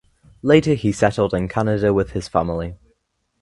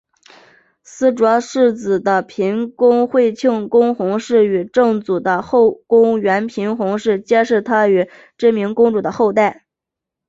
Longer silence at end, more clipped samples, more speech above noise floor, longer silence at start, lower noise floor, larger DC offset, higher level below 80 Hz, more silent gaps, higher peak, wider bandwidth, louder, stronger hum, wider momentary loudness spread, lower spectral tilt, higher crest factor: about the same, 0.65 s vs 0.75 s; neither; second, 50 dB vs 69 dB; second, 0.45 s vs 0.95 s; second, -68 dBFS vs -84 dBFS; neither; first, -40 dBFS vs -60 dBFS; neither; about the same, 0 dBFS vs -2 dBFS; first, 11.5 kHz vs 7.8 kHz; second, -19 LUFS vs -15 LUFS; neither; first, 11 LU vs 5 LU; about the same, -6.5 dB/octave vs -6 dB/octave; first, 20 dB vs 14 dB